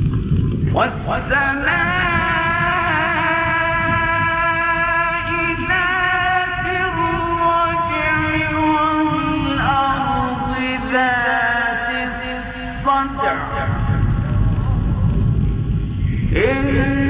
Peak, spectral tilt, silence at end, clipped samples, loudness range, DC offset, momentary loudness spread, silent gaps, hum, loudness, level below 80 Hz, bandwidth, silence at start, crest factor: -4 dBFS; -10 dB/octave; 0 s; under 0.1%; 3 LU; under 0.1%; 5 LU; none; none; -18 LUFS; -28 dBFS; 4 kHz; 0 s; 14 dB